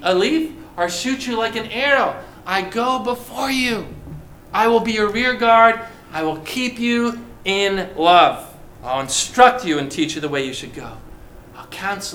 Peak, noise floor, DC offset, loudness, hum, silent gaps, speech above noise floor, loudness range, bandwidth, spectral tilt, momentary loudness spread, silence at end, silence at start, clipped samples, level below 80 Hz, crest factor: 0 dBFS; -39 dBFS; under 0.1%; -18 LUFS; none; none; 21 dB; 4 LU; 18.5 kHz; -3 dB/octave; 17 LU; 0 s; 0 s; under 0.1%; -46 dBFS; 20 dB